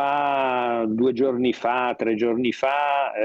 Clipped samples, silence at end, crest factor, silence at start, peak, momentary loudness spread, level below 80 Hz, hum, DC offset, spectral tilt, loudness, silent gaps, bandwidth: under 0.1%; 0 s; 12 dB; 0 s; -10 dBFS; 2 LU; -64 dBFS; none; under 0.1%; -6 dB/octave; -22 LUFS; none; 7.6 kHz